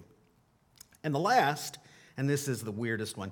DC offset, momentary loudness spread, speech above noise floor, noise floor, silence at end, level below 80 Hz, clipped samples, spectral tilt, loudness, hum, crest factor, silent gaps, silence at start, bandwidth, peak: under 0.1%; 15 LU; 37 dB; -68 dBFS; 0 s; -74 dBFS; under 0.1%; -5 dB/octave; -31 LUFS; none; 22 dB; none; 0 s; 19 kHz; -10 dBFS